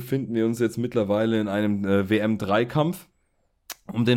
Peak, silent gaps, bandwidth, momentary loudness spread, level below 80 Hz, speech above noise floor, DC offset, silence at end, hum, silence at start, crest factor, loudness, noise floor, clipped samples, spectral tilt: -8 dBFS; none; 17 kHz; 9 LU; -60 dBFS; 46 dB; under 0.1%; 0 s; none; 0 s; 16 dB; -24 LUFS; -69 dBFS; under 0.1%; -6.5 dB/octave